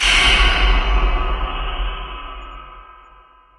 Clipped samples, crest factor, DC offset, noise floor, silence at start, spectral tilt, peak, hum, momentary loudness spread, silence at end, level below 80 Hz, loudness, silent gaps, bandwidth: under 0.1%; 18 dB; under 0.1%; -48 dBFS; 0 s; -2.5 dB/octave; -2 dBFS; none; 23 LU; 0.65 s; -20 dBFS; -17 LUFS; none; 11.5 kHz